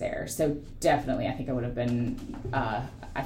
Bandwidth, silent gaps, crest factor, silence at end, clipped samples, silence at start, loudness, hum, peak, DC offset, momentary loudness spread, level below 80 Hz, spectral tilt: 16 kHz; none; 18 dB; 0 s; under 0.1%; 0 s; -30 LUFS; none; -12 dBFS; under 0.1%; 7 LU; -44 dBFS; -6 dB/octave